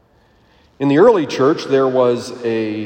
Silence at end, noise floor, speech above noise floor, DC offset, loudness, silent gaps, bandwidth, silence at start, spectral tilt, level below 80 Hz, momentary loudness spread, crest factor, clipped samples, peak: 0 s; -53 dBFS; 39 dB; under 0.1%; -15 LUFS; none; 9.6 kHz; 0.8 s; -6.5 dB/octave; -60 dBFS; 10 LU; 16 dB; under 0.1%; 0 dBFS